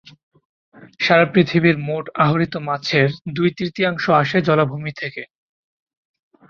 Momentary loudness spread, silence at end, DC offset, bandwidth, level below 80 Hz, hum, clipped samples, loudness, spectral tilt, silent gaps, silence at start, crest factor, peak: 11 LU; 1.25 s; under 0.1%; 7 kHz; -58 dBFS; none; under 0.1%; -18 LUFS; -7 dB/octave; none; 0.75 s; 18 dB; -2 dBFS